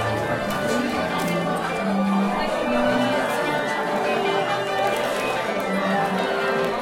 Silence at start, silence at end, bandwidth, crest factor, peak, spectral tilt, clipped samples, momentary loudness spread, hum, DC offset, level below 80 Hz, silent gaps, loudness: 0 s; 0 s; 16.5 kHz; 12 dB; -10 dBFS; -5 dB/octave; under 0.1%; 3 LU; none; under 0.1%; -50 dBFS; none; -23 LUFS